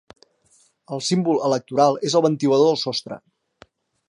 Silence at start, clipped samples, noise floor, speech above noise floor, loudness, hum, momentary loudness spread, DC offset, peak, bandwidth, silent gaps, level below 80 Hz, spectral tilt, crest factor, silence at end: 0.9 s; under 0.1%; -60 dBFS; 41 dB; -20 LUFS; none; 13 LU; under 0.1%; -4 dBFS; 11 kHz; none; -70 dBFS; -5.5 dB/octave; 18 dB; 0.9 s